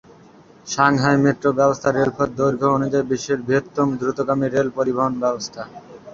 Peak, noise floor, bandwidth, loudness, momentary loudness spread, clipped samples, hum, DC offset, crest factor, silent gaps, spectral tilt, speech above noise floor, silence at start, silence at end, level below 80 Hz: -2 dBFS; -47 dBFS; 7.6 kHz; -19 LUFS; 10 LU; under 0.1%; none; under 0.1%; 18 dB; none; -6 dB/octave; 28 dB; 0.65 s; 0 s; -54 dBFS